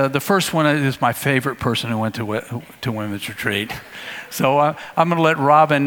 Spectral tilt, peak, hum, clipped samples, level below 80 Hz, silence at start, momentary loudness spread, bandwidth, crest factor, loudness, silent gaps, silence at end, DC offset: -5 dB/octave; 0 dBFS; none; under 0.1%; -54 dBFS; 0 s; 12 LU; 19 kHz; 18 dB; -19 LUFS; none; 0 s; under 0.1%